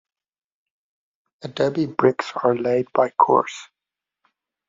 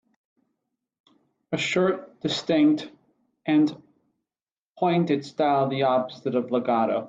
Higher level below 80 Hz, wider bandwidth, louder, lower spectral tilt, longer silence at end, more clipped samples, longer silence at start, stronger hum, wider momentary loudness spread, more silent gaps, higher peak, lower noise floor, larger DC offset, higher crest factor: first, -66 dBFS vs -72 dBFS; about the same, 7.6 kHz vs 7.8 kHz; first, -20 LUFS vs -24 LUFS; about the same, -5 dB/octave vs -6 dB/octave; first, 1.05 s vs 0 s; neither; about the same, 1.45 s vs 1.5 s; neither; first, 16 LU vs 7 LU; second, none vs 4.51-4.75 s; first, -2 dBFS vs -10 dBFS; about the same, -87 dBFS vs under -90 dBFS; neither; first, 22 dB vs 16 dB